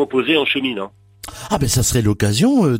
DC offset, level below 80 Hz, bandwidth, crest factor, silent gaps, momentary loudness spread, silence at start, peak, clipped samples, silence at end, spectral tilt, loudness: under 0.1%; -36 dBFS; 16.5 kHz; 16 dB; none; 18 LU; 0 s; -2 dBFS; under 0.1%; 0 s; -4.5 dB/octave; -17 LUFS